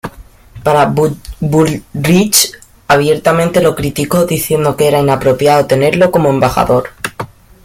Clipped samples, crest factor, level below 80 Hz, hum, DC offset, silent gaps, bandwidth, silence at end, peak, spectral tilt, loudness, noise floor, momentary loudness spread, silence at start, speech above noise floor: under 0.1%; 12 dB; -36 dBFS; none; under 0.1%; none; 17 kHz; 0.4 s; 0 dBFS; -4.5 dB/octave; -11 LUFS; -35 dBFS; 9 LU; 0.05 s; 24 dB